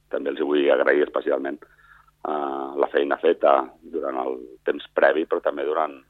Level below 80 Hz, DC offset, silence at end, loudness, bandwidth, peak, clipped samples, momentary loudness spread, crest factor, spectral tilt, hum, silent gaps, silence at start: -66 dBFS; under 0.1%; 0.1 s; -23 LUFS; 4.5 kHz; -4 dBFS; under 0.1%; 11 LU; 20 dB; -6.5 dB/octave; 50 Hz at -65 dBFS; none; 0.1 s